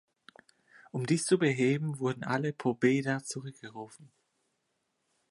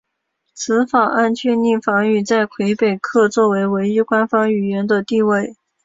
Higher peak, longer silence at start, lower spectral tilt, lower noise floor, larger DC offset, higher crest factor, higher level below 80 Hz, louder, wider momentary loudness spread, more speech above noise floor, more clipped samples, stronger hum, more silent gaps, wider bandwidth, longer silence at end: second, -12 dBFS vs -2 dBFS; first, 0.95 s vs 0.55 s; about the same, -5.5 dB/octave vs -5.5 dB/octave; first, -80 dBFS vs -73 dBFS; neither; first, 20 dB vs 14 dB; second, -78 dBFS vs -62 dBFS; second, -30 LUFS vs -16 LUFS; first, 18 LU vs 4 LU; second, 49 dB vs 57 dB; neither; neither; neither; first, 11.5 kHz vs 7.8 kHz; first, 1.25 s vs 0.3 s